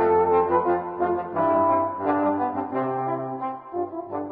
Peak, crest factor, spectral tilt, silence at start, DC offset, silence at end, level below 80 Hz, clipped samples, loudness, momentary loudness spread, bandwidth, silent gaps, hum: -8 dBFS; 16 dB; -12 dB/octave; 0 s; under 0.1%; 0 s; -54 dBFS; under 0.1%; -24 LUFS; 11 LU; 4.5 kHz; none; none